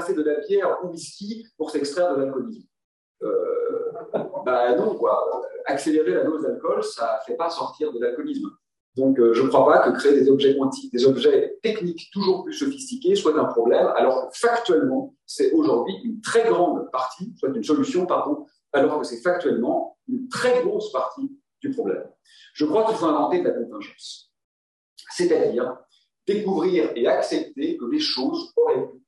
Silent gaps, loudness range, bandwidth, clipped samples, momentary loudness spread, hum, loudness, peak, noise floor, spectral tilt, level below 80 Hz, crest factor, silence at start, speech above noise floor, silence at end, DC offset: 2.84-3.15 s, 8.80-8.93 s, 24.44-24.96 s; 7 LU; 12 kHz; under 0.1%; 13 LU; none; -22 LUFS; -4 dBFS; under -90 dBFS; -5 dB/octave; -74 dBFS; 18 dB; 0 s; over 68 dB; 0.1 s; under 0.1%